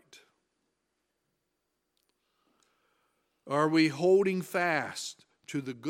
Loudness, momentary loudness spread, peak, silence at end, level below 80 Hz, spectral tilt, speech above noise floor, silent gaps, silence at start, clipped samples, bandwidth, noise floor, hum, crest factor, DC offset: -28 LUFS; 14 LU; -12 dBFS; 0 s; -84 dBFS; -5 dB/octave; 53 dB; none; 3.45 s; under 0.1%; 16.5 kHz; -82 dBFS; none; 20 dB; under 0.1%